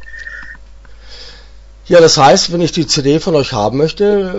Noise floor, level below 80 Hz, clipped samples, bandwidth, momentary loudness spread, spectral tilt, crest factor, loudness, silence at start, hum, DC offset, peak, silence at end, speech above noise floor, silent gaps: -36 dBFS; -38 dBFS; under 0.1%; 8 kHz; 21 LU; -4 dB/octave; 12 dB; -11 LUFS; 0 s; none; under 0.1%; 0 dBFS; 0 s; 26 dB; none